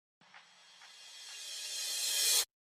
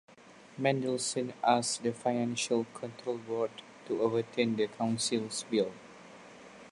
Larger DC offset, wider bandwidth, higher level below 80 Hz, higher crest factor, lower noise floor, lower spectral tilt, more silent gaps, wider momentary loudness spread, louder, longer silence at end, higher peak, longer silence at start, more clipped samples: neither; first, 16 kHz vs 11.5 kHz; second, under -90 dBFS vs -76 dBFS; about the same, 22 dB vs 22 dB; first, -60 dBFS vs -52 dBFS; second, 5 dB/octave vs -4 dB/octave; neither; about the same, 24 LU vs 22 LU; about the same, -32 LUFS vs -32 LUFS; first, 0.15 s vs 0 s; second, -16 dBFS vs -12 dBFS; about the same, 0.35 s vs 0.25 s; neither